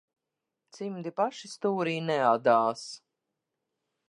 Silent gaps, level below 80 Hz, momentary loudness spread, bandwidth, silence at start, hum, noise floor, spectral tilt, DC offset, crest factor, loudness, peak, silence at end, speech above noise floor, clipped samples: none; -84 dBFS; 16 LU; 11 kHz; 0.75 s; none; -87 dBFS; -5.5 dB/octave; under 0.1%; 20 dB; -28 LUFS; -10 dBFS; 1.1 s; 59 dB; under 0.1%